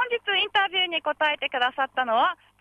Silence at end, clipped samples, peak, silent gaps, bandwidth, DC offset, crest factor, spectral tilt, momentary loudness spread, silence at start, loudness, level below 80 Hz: 0.25 s; under 0.1%; -10 dBFS; none; 10 kHz; under 0.1%; 14 dB; -2.5 dB/octave; 3 LU; 0 s; -24 LUFS; -70 dBFS